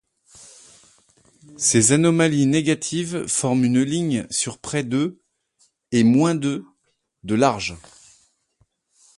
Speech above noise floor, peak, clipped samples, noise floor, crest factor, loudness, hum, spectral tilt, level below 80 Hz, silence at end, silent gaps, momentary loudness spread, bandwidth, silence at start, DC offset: 51 dB; -4 dBFS; under 0.1%; -71 dBFS; 18 dB; -20 LUFS; none; -4.5 dB/octave; -56 dBFS; 1.4 s; none; 11 LU; 11.5 kHz; 1.6 s; under 0.1%